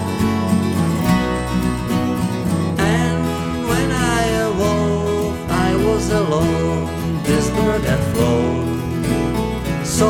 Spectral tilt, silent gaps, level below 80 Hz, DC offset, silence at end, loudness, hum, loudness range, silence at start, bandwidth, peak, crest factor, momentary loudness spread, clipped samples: -6 dB/octave; none; -32 dBFS; under 0.1%; 0 s; -18 LUFS; none; 1 LU; 0 s; 17.5 kHz; -2 dBFS; 16 dB; 4 LU; under 0.1%